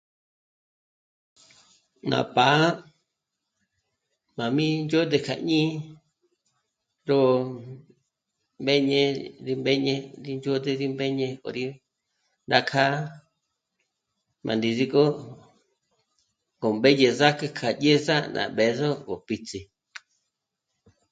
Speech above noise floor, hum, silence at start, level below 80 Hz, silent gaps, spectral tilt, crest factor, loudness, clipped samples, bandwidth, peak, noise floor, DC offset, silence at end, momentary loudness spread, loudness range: 59 dB; none; 2.05 s; -68 dBFS; none; -5.5 dB/octave; 24 dB; -24 LUFS; under 0.1%; 9.2 kHz; -2 dBFS; -82 dBFS; under 0.1%; 1.5 s; 17 LU; 5 LU